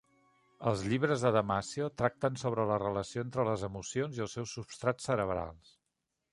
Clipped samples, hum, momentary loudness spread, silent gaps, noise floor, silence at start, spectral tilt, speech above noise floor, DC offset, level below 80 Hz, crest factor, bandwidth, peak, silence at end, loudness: under 0.1%; none; 9 LU; none; -85 dBFS; 0.6 s; -5.5 dB/octave; 52 dB; under 0.1%; -60 dBFS; 22 dB; 11.5 kHz; -12 dBFS; 0.75 s; -33 LUFS